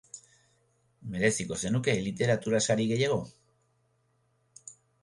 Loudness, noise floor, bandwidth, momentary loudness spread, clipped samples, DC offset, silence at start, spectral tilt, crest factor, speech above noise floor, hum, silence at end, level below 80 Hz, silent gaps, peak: -29 LUFS; -72 dBFS; 11.5 kHz; 22 LU; under 0.1%; under 0.1%; 0.15 s; -4.5 dB/octave; 20 dB; 44 dB; none; 0.3 s; -60 dBFS; none; -12 dBFS